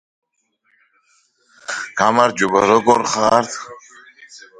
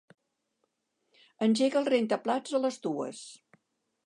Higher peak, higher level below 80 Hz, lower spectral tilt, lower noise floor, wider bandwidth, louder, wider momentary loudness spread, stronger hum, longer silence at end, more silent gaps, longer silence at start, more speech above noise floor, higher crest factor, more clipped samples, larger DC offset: first, 0 dBFS vs -14 dBFS; first, -58 dBFS vs -84 dBFS; second, -3.5 dB/octave vs -5 dB/octave; second, -66 dBFS vs -79 dBFS; about the same, 11 kHz vs 11 kHz; first, -16 LUFS vs -29 LUFS; first, 16 LU vs 13 LU; neither; second, 0.25 s vs 0.7 s; neither; first, 1.7 s vs 1.4 s; about the same, 51 dB vs 51 dB; about the same, 18 dB vs 18 dB; neither; neither